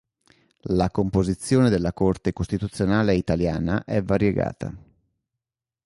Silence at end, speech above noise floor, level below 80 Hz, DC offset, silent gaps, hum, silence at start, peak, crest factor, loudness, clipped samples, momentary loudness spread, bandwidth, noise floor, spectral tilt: 1.1 s; 65 dB; -40 dBFS; under 0.1%; none; none; 0.65 s; -8 dBFS; 16 dB; -23 LUFS; under 0.1%; 8 LU; 11.5 kHz; -87 dBFS; -7 dB/octave